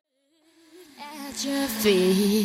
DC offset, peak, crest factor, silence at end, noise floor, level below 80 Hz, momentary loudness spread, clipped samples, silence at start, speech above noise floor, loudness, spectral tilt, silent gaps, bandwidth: under 0.1%; -10 dBFS; 16 dB; 0 s; -65 dBFS; -60 dBFS; 20 LU; under 0.1%; 0.75 s; 43 dB; -23 LUFS; -4.5 dB/octave; none; 16 kHz